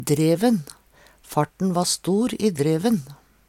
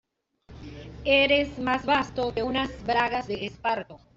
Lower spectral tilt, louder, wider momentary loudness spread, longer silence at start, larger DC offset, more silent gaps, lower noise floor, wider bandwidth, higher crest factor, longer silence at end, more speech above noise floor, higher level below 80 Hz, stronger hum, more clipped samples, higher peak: about the same, -5.5 dB/octave vs -5 dB/octave; first, -22 LUFS vs -25 LUFS; second, 7 LU vs 18 LU; second, 0 s vs 0.5 s; neither; neither; about the same, -52 dBFS vs -55 dBFS; first, 17.5 kHz vs 7.8 kHz; about the same, 16 dB vs 18 dB; first, 0.35 s vs 0.2 s; about the same, 31 dB vs 29 dB; second, -58 dBFS vs -48 dBFS; neither; neither; about the same, -6 dBFS vs -8 dBFS